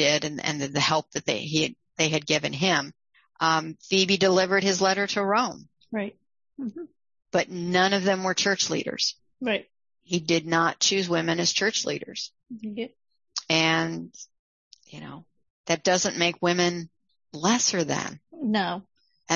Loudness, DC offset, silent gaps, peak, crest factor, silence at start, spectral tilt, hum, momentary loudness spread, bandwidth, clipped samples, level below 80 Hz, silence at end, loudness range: -25 LUFS; under 0.1%; 14.39-14.71 s, 15.50-15.64 s; -6 dBFS; 20 dB; 0 s; -3 dB/octave; none; 16 LU; 7.6 kHz; under 0.1%; -68 dBFS; 0 s; 4 LU